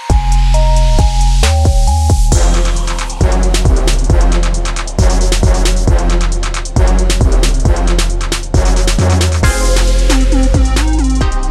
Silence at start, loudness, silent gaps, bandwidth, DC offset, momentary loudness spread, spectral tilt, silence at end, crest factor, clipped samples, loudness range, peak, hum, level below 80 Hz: 0 s; -13 LUFS; none; 12.5 kHz; under 0.1%; 4 LU; -5 dB/octave; 0 s; 8 dB; under 0.1%; 1 LU; -2 dBFS; none; -10 dBFS